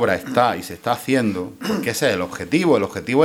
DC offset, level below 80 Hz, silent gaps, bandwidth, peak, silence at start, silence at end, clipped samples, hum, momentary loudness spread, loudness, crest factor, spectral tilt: under 0.1%; -56 dBFS; none; 17 kHz; -2 dBFS; 0 s; 0 s; under 0.1%; none; 7 LU; -20 LUFS; 18 dB; -5 dB/octave